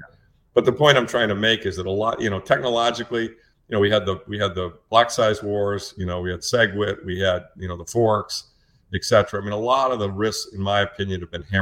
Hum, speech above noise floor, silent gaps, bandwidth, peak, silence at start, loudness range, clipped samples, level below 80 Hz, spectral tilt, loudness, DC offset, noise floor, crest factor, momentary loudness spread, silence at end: none; 35 dB; none; 16.5 kHz; 0 dBFS; 0 s; 3 LU; under 0.1%; -50 dBFS; -4.5 dB/octave; -22 LUFS; under 0.1%; -56 dBFS; 22 dB; 10 LU; 0 s